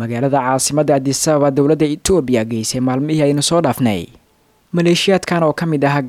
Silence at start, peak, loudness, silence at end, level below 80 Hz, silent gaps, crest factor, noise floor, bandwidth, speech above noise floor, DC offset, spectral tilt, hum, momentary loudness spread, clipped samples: 0 s; -2 dBFS; -15 LUFS; 0 s; -44 dBFS; none; 12 dB; -56 dBFS; 16 kHz; 41 dB; under 0.1%; -5 dB/octave; none; 4 LU; under 0.1%